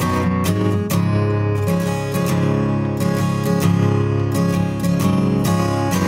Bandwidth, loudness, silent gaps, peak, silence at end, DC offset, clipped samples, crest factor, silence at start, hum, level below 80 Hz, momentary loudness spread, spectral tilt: 16.5 kHz; -18 LUFS; none; -4 dBFS; 0 s; under 0.1%; under 0.1%; 14 dB; 0 s; none; -42 dBFS; 3 LU; -7 dB/octave